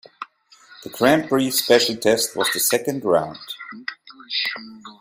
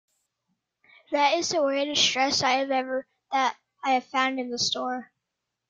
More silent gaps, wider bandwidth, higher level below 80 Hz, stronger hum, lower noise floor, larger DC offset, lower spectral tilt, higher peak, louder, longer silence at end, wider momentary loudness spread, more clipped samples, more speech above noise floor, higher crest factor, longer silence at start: neither; first, 16 kHz vs 9.4 kHz; first, -62 dBFS vs -72 dBFS; neither; second, -51 dBFS vs -84 dBFS; neither; about the same, -2.5 dB/octave vs -1.5 dB/octave; first, -2 dBFS vs -10 dBFS; first, -19 LUFS vs -25 LUFS; second, 0.1 s vs 0.65 s; first, 21 LU vs 10 LU; neither; second, 30 dB vs 59 dB; about the same, 20 dB vs 18 dB; second, 0.2 s vs 1.1 s